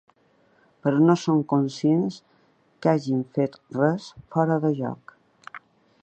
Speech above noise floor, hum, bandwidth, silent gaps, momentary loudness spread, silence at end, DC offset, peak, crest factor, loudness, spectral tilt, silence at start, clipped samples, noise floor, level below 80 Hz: 39 dB; none; 8.6 kHz; none; 22 LU; 0.45 s; under 0.1%; -4 dBFS; 20 dB; -24 LUFS; -7.5 dB/octave; 0.85 s; under 0.1%; -62 dBFS; -68 dBFS